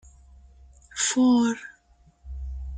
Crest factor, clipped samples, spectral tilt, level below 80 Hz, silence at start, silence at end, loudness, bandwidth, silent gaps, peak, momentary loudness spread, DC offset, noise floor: 14 dB; under 0.1%; -3.5 dB/octave; -42 dBFS; 0.95 s; 0 s; -23 LUFS; 9.4 kHz; none; -12 dBFS; 22 LU; under 0.1%; -59 dBFS